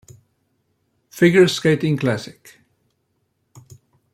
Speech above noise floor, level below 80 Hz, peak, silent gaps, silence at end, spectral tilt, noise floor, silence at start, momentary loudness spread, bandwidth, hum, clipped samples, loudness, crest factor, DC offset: 53 dB; -62 dBFS; -2 dBFS; none; 1.85 s; -6 dB/octave; -70 dBFS; 1.15 s; 20 LU; 15 kHz; none; under 0.1%; -17 LUFS; 18 dB; under 0.1%